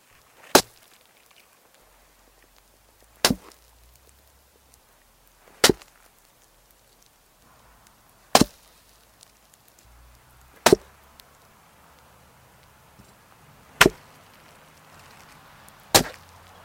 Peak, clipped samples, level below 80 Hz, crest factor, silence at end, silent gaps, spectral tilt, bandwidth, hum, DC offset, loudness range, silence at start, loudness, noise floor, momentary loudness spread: 0 dBFS; under 0.1%; -52 dBFS; 28 dB; 0.55 s; none; -2.5 dB/octave; 17 kHz; none; under 0.1%; 6 LU; 0.55 s; -21 LUFS; -58 dBFS; 15 LU